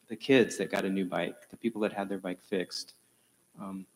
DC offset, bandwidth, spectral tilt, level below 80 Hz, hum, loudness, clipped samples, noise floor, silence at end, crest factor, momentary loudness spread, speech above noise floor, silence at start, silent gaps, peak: under 0.1%; 16 kHz; -5 dB/octave; -74 dBFS; none; -31 LUFS; under 0.1%; -68 dBFS; 0.1 s; 22 dB; 17 LU; 37 dB; 0.1 s; none; -12 dBFS